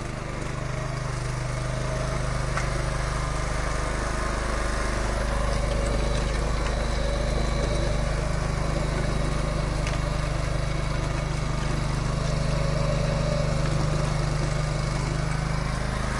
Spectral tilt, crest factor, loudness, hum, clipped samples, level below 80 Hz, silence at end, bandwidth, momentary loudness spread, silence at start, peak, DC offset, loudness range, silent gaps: -5.5 dB/octave; 14 dB; -27 LUFS; none; under 0.1%; -30 dBFS; 0 s; 11.5 kHz; 3 LU; 0 s; -12 dBFS; under 0.1%; 2 LU; none